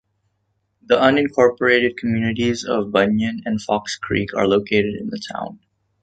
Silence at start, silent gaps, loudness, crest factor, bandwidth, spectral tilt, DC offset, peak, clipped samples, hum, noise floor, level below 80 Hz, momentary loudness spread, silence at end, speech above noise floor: 0.9 s; none; -19 LUFS; 18 dB; 9 kHz; -5.5 dB/octave; under 0.1%; -2 dBFS; under 0.1%; none; -70 dBFS; -50 dBFS; 12 LU; 0.45 s; 51 dB